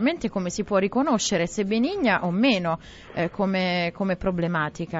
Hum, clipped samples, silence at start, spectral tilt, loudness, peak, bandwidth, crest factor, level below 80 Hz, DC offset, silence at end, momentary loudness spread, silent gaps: none; under 0.1%; 0 s; -5 dB/octave; -24 LUFS; -8 dBFS; 8 kHz; 16 dB; -50 dBFS; under 0.1%; 0 s; 7 LU; none